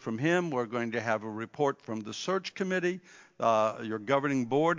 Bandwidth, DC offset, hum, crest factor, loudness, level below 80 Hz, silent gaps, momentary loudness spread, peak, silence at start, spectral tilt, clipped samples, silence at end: 7.6 kHz; under 0.1%; none; 20 dB; -31 LUFS; -78 dBFS; none; 9 LU; -10 dBFS; 0 s; -5.5 dB/octave; under 0.1%; 0 s